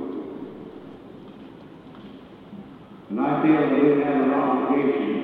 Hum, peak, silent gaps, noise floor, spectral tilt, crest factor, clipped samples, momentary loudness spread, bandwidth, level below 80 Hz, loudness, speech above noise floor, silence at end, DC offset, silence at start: none; -8 dBFS; none; -43 dBFS; -9.5 dB/octave; 16 dB; under 0.1%; 24 LU; 4.5 kHz; -64 dBFS; -21 LUFS; 23 dB; 0 s; under 0.1%; 0 s